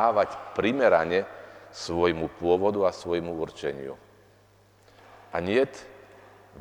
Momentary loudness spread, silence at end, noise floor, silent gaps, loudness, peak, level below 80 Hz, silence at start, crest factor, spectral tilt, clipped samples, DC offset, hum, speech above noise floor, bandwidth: 19 LU; 0 s; -59 dBFS; none; -26 LUFS; -8 dBFS; -58 dBFS; 0 s; 20 dB; -5.5 dB/octave; under 0.1%; under 0.1%; 50 Hz at -65 dBFS; 33 dB; 19 kHz